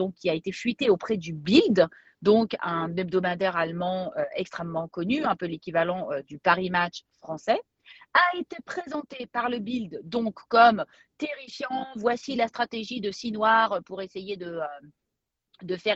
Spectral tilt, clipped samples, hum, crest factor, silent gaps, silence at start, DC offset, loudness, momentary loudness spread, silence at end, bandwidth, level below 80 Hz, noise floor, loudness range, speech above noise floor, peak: -5.5 dB/octave; under 0.1%; none; 22 dB; none; 0 s; under 0.1%; -26 LUFS; 14 LU; 0 s; 8 kHz; -64 dBFS; -84 dBFS; 4 LU; 57 dB; -4 dBFS